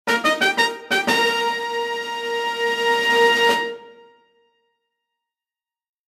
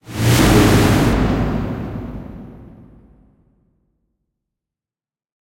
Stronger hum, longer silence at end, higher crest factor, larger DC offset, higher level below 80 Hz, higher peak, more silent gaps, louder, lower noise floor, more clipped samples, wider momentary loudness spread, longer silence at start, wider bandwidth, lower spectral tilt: neither; second, 2.15 s vs 2.75 s; about the same, 18 dB vs 18 dB; neither; second, -70 dBFS vs -28 dBFS; about the same, -4 dBFS vs -2 dBFS; neither; second, -19 LUFS vs -15 LUFS; about the same, under -90 dBFS vs under -90 dBFS; neither; second, 10 LU vs 21 LU; about the same, 0.05 s vs 0.1 s; about the same, 15.5 kHz vs 16.5 kHz; second, -1.5 dB/octave vs -5.5 dB/octave